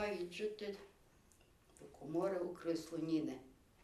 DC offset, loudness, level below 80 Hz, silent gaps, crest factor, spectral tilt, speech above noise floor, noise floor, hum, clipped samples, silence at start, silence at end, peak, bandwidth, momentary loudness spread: under 0.1%; -42 LUFS; -72 dBFS; none; 16 dB; -6 dB/octave; 27 dB; -69 dBFS; none; under 0.1%; 0 s; 0.3 s; -26 dBFS; 13 kHz; 17 LU